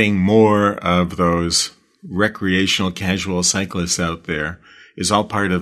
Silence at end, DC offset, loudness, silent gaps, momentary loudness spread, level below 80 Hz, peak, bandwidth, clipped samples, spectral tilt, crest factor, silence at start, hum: 0 s; under 0.1%; -18 LUFS; none; 9 LU; -44 dBFS; 0 dBFS; 13.5 kHz; under 0.1%; -4 dB/octave; 18 dB; 0 s; none